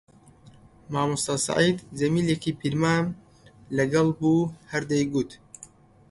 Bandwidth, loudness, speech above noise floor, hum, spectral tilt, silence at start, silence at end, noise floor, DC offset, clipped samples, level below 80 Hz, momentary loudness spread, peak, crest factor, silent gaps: 11.5 kHz; -25 LUFS; 28 dB; none; -5 dB/octave; 0.9 s; 0.45 s; -52 dBFS; under 0.1%; under 0.1%; -56 dBFS; 11 LU; -8 dBFS; 18 dB; none